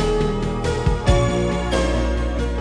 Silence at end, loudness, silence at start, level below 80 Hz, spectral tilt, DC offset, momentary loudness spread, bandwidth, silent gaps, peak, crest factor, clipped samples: 0 s; -21 LUFS; 0 s; -24 dBFS; -6 dB/octave; under 0.1%; 5 LU; 10.5 kHz; none; -4 dBFS; 16 dB; under 0.1%